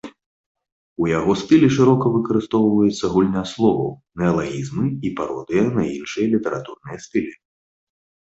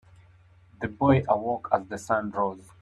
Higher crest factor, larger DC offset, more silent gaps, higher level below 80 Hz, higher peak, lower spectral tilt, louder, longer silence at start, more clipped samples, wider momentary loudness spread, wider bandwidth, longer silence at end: about the same, 18 dB vs 20 dB; neither; first, 0.26-0.55 s, 0.72-0.96 s vs none; first, -50 dBFS vs -56 dBFS; first, -2 dBFS vs -8 dBFS; about the same, -7 dB/octave vs -7.5 dB/octave; first, -20 LUFS vs -26 LUFS; second, 0.05 s vs 0.8 s; neither; first, 12 LU vs 9 LU; second, 8 kHz vs 12 kHz; first, 0.95 s vs 0.2 s